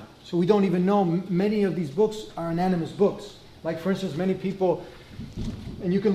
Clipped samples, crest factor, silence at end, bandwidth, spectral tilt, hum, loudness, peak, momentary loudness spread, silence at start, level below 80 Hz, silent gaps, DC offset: under 0.1%; 18 dB; 0 s; 12.5 kHz; -8 dB/octave; none; -26 LUFS; -8 dBFS; 13 LU; 0 s; -50 dBFS; none; under 0.1%